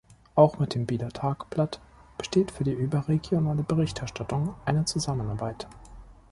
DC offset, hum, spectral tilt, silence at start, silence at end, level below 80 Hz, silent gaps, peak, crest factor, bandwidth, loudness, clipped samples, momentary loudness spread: under 0.1%; none; -6.5 dB/octave; 0.35 s; 0.2 s; -50 dBFS; none; -6 dBFS; 22 dB; 11.5 kHz; -27 LUFS; under 0.1%; 13 LU